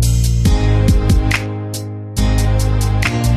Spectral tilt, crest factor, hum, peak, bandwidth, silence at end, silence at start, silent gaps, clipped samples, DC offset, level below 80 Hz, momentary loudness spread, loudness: -5.5 dB/octave; 12 dB; none; -2 dBFS; 14 kHz; 0 s; 0 s; none; under 0.1%; under 0.1%; -18 dBFS; 10 LU; -16 LUFS